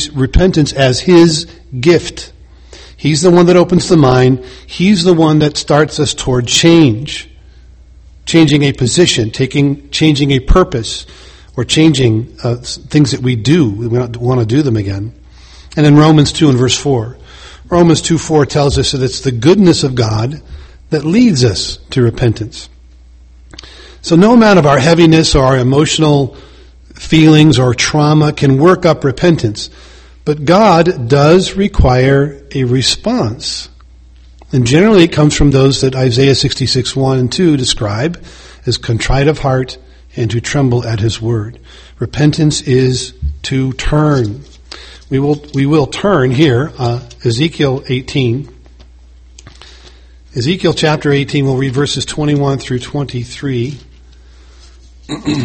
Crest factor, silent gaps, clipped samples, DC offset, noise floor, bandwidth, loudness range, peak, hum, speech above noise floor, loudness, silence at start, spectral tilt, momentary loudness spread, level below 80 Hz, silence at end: 12 dB; none; 0.3%; under 0.1%; -39 dBFS; 8.8 kHz; 6 LU; 0 dBFS; none; 28 dB; -11 LUFS; 0 s; -5.5 dB/octave; 14 LU; -28 dBFS; 0 s